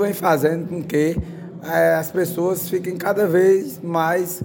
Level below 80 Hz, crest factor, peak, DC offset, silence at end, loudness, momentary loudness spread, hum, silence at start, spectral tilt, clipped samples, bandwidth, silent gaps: -46 dBFS; 16 dB; -4 dBFS; under 0.1%; 0 s; -20 LUFS; 8 LU; none; 0 s; -6 dB/octave; under 0.1%; 17 kHz; none